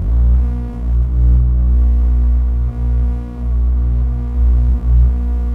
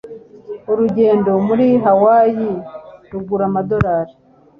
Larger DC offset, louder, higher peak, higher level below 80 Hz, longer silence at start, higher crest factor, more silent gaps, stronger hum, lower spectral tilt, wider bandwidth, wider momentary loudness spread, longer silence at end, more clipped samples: neither; about the same, -16 LUFS vs -15 LUFS; about the same, -4 dBFS vs -2 dBFS; first, -12 dBFS vs -44 dBFS; about the same, 0 s vs 0.05 s; about the same, 10 dB vs 14 dB; neither; first, 60 Hz at -20 dBFS vs none; about the same, -11 dB/octave vs -10.5 dB/octave; second, 1.7 kHz vs 5.2 kHz; second, 6 LU vs 18 LU; second, 0 s vs 0.5 s; neither